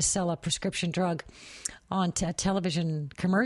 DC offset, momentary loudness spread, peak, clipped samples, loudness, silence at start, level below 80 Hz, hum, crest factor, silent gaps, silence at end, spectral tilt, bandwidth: under 0.1%; 9 LU; -8 dBFS; under 0.1%; -30 LUFS; 0 s; -52 dBFS; none; 20 dB; none; 0 s; -4 dB/octave; 11.5 kHz